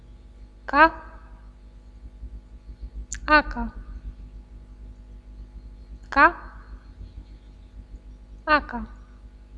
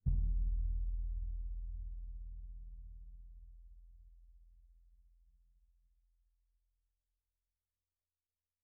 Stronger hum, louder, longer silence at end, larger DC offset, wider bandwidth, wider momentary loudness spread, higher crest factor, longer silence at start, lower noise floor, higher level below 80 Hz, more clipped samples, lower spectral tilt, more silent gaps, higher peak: first, 50 Hz at -40 dBFS vs none; first, -21 LUFS vs -44 LUFS; second, 0 s vs 3.95 s; neither; first, 10 kHz vs 0.5 kHz; first, 28 LU vs 24 LU; first, 26 dB vs 20 dB; about the same, 0.1 s vs 0.05 s; second, -46 dBFS vs under -90 dBFS; about the same, -40 dBFS vs -42 dBFS; neither; second, -4.5 dB/octave vs -21.5 dB/octave; neither; first, -2 dBFS vs -22 dBFS